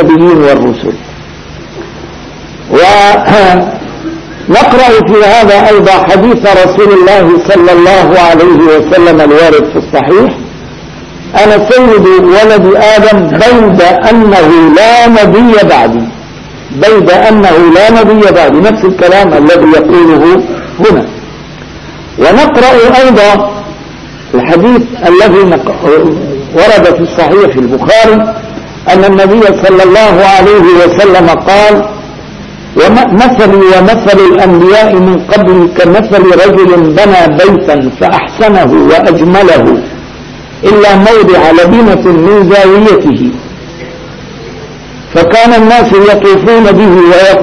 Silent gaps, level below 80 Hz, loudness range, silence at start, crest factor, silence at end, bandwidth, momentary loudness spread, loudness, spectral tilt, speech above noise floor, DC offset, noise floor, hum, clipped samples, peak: none; -30 dBFS; 4 LU; 0 s; 4 dB; 0 s; 11 kHz; 20 LU; -4 LUFS; -6 dB/octave; 22 dB; under 0.1%; -25 dBFS; none; 10%; 0 dBFS